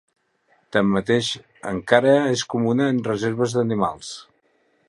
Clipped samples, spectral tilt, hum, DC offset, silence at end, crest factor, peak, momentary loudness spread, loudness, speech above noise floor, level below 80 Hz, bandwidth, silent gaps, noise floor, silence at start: under 0.1%; -5.5 dB/octave; none; under 0.1%; 0.65 s; 22 dB; 0 dBFS; 13 LU; -21 LUFS; 44 dB; -56 dBFS; 11.5 kHz; none; -64 dBFS; 0.75 s